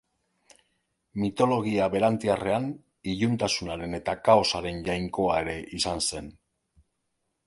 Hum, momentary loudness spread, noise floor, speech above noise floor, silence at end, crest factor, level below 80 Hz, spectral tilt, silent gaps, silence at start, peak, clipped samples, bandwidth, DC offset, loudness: none; 12 LU; -78 dBFS; 52 dB; 1.15 s; 22 dB; -52 dBFS; -4.5 dB/octave; none; 1.15 s; -6 dBFS; under 0.1%; 11.5 kHz; under 0.1%; -26 LUFS